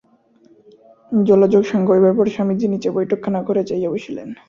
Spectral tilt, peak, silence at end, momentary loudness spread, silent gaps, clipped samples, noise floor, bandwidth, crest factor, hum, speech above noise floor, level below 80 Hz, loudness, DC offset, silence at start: -8.5 dB/octave; -2 dBFS; 0.15 s; 9 LU; none; under 0.1%; -54 dBFS; 7.2 kHz; 16 dB; none; 37 dB; -58 dBFS; -17 LUFS; under 0.1%; 1.1 s